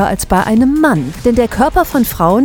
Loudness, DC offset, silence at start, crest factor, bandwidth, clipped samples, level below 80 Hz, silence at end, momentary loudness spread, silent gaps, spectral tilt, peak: -12 LUFS; under 0.1%; 0 s; 12 dB; 20 kHz; under 0.1%; -28 dBFS; 0 s; 3 LU; none; -6 dB/octave; 0 dBFS